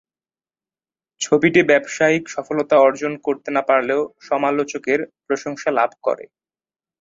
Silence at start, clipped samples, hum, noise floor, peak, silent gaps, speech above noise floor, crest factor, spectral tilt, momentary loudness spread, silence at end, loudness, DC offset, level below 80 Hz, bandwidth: 1.2 s; under 0.1%; none; under -90 dBFS; -2 dBFS; none; over 71 dB; 18 dB; -4.5 dB/octave; 10 LU; 0.8 s; -19 LUFS; under 0.1%; -64 dBFS; 7.8 kHz